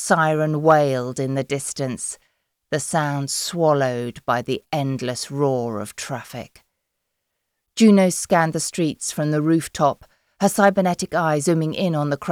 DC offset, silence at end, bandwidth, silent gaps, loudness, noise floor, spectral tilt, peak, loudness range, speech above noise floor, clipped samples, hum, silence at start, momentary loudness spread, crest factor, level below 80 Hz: under 0.1%; 0 s; 16.5 kHz; none; -21 LUFS; -77 dBFS; -5 dB/octave; -4 dBFS; 6 LU; 57 dB; under 0.1%; none; 0 s; 12 LU; 18 dB; -60 dBFS